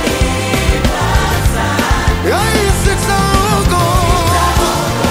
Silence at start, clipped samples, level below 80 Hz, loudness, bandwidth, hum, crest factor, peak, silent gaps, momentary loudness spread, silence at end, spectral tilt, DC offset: 0 s; under 0.1%; -18 dBFS; -13 LUFS; 16.5 kHz; none; 12 dB; 0 dBFS; none; 2 LU; 0 s; -4.5 dB/octave; under 0.1%